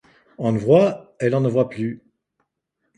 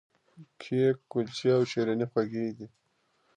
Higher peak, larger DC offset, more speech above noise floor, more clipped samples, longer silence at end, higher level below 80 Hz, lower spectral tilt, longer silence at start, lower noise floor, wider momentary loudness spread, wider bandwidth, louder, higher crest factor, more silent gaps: first, -4 dBFS vs -14 dBFS; neither; first, 57 dB vs 43 dB; neither; first, 1 s vs 0.7 s; first, -60 dBFS vs -74 dBFS; first, -8.5 dB/octave vs -6.5 dB/octave; about the same, 0.4 s vs 0.4 s; about the same, -75 dBFS vs -72 dBFS; second, 13 LU vs 17 LU; about the same, 10.5 kHz vs 9.6 kHz; first, -20 LUFS vs -29 LUFS; about the same, 18 dB vs 16 dB; neither